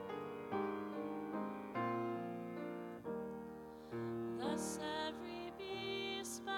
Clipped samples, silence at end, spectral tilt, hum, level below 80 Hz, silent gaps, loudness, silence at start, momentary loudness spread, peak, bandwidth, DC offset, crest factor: under 0.1%; 0 s; -4.5 dB/octave; none; -74 dBFS; none; -44 LUFS; 0 s; 7 LU; -28 dBFS; 18.5 kHz; under 0.1%; 16 dB